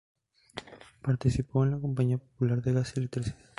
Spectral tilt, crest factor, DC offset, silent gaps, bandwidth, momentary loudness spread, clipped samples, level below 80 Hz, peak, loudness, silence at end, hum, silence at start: -8 dB/octave; 18 dB; under 0.1%; none; 11.5 kHz; 16 LU; under 0.1%; -50 dBFS; -12 dBFS; -30 LUFS; 0.25 s; none; 0.55 s